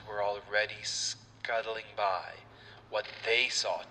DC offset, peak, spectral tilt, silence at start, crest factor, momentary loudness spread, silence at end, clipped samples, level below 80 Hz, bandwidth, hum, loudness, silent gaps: under 0.1%; -12 dBFS; -0.5 dB/octave; 0 s; 22 dB; 12 LU; 0 s; under 0.1%; -68 dBFS; 11 kHz; none; -32 LUFS; none